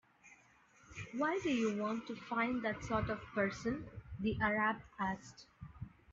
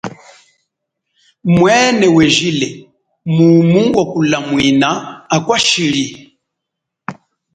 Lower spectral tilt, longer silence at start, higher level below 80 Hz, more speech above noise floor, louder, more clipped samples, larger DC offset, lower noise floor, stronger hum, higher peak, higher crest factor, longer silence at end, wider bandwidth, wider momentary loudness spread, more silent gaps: about the same, -4.5 dB/octave vs -5 dB/octave; first, 0.25 s vs 0.05 s; second, -60 dBFS vs -48 dBFS; second, 29 dB vs 67 dB; second, -38 LUFS vs -12 LUFS; neither; neither; second, -67 dBFS vs -78 dBFS; neither; second, -20 dBFS vs 0 dBFS; about the same, 18 dB vs 14 dB; second, 0 s vs 0.45 s; second, 7.8 kHz vs 9.4 kHz; about the same, 17 LU vs 18 LU; neither